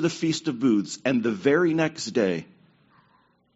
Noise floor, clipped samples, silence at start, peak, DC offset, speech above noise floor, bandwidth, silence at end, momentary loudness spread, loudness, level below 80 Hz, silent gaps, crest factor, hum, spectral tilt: -63 dBFS; under 0.1%; 0 s; -8 dBFS; under 0.1%; 40 dB; 8 kHz; 1.1 s; 5 LU; -24 LUFS; -68 dBFS; none; 18 dB; none; -5 dB/octave